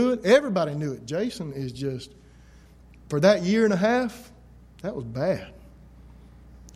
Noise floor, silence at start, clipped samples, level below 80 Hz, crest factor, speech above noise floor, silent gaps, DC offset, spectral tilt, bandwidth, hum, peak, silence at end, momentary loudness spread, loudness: -51 dBFS; 0 s; under 0.1%; -52 dBFS; 20 dB; 27 dB; none; under 0.1%; -6 dB/octave; 15 kHz; none; -6 dBFS; 0.05 s; 16 LU; -24 LUFS